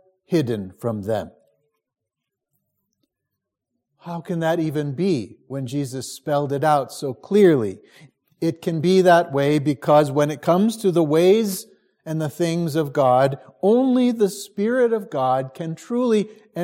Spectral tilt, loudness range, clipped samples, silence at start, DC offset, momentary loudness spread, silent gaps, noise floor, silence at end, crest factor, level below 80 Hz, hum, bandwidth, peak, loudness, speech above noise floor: -6.5 dB/octave; 11 LU; under 0.1%; 0.3 s; under 0.1%; 13 LU; none; -83 dBFS; 0 s; 18 dB; -68 dBFS; none; 16.5 kHz; -4 dBFS; -20 LUFS; 63 dB